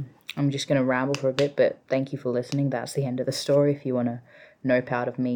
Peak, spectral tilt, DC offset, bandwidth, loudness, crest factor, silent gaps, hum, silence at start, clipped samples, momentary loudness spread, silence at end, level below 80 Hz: -10 dBFS; -6 dB/octave; under 0.1%; 18 kHz; -25 LUFS; 16 dB; none; none; 0 s; under 0.1%; 6 LU; 0 s; -68 dBFS